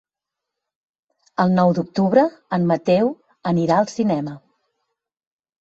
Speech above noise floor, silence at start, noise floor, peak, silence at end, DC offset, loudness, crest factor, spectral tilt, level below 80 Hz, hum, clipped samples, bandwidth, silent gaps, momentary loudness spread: 67 dB; 1.4 s; -85 dBFS; -2 dBFS; 1.25 s; under 0.1%; -19 LUFS; 20 dB; -7.5 dB/octave; -60 dBFS; none; under 0.1%; 7.8 kHz; none; 8 LU